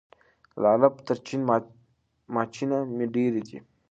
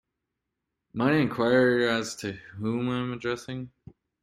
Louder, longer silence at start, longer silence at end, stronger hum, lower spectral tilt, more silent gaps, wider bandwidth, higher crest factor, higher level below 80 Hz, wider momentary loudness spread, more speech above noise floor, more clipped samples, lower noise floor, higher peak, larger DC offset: about the same, -26 LUFS vs -26 LUFS; second, 0.55 s vs 0.95 s; second, 0.3 s vs 0.55 s; neither; first, -7.5 dB/octave vs -5.5 dB/octave; neither; second, 8 kHz vs 14 kHz; about the same, 22 dB vs 20 dB; second, -70 dBFS vs -62 dBFS; second, 12 LU vs 16 LU; second, 41 dB vs 57 dB; neither; second, -66 dBFS vs -84 dBFS; first, -4 dBFS vs -8 dBFS; neither